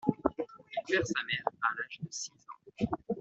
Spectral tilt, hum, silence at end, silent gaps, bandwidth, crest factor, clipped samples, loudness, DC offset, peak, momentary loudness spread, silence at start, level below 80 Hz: -4 dB/octave; none; 0 s; none; 8.2 kHz; 26 dB; under 0.1%; -35 LUFS; under 0.1%; -8 dBFS; 11 LU; 0.05 s; -62 dBFS